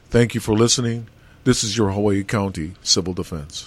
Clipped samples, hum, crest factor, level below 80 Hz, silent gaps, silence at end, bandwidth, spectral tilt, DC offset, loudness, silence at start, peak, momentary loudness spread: under 0.1%; none; 18 dB; -42 dBFS; none; 0 s; 13 kHz; -4 dB/octave; under 0.1%; -20 LUFS; 0.1 s; -4 dBFS; 10 LU